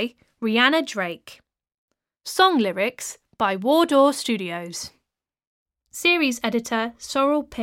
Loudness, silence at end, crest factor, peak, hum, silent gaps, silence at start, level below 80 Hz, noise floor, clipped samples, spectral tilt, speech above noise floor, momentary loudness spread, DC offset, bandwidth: -21 LUFS; 0 s; 20 dB; -2 dBFS; none; 1.74-1.88 s, 5.47-5.66 s; 0 s; -62 dBFS; -80 dBFS; under 0.1%; -3 dB/octave; 58 dB; 16 LU; under 0.1%; 17 kHz